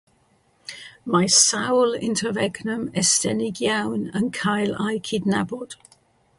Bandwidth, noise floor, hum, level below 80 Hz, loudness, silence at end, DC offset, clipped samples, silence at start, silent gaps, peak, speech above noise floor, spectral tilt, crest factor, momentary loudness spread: 11.5 kHz; -62 dBFS; none; -60 dBFS; -21 LUFS; 0.65 s; under 0.1%; under 0.1%; 0.7 s; none; -2 dBFS; 40 dB; -3 dB/octave; 22 dB; 21 LU